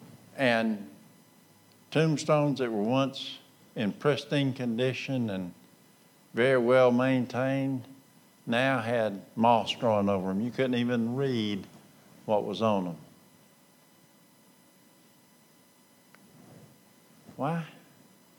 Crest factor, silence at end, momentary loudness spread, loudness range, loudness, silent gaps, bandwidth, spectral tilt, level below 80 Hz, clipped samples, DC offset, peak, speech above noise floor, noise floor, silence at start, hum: 20 dB; 0.65 s; 14 LU; 8 LU; -28 LUFS; none; 19 kHz; -6.5 dB/octave; -82 dBFS; under 0.1%; under 0.1%; -10 dBFS; 33 dB; -61 dBFS; 0 s; none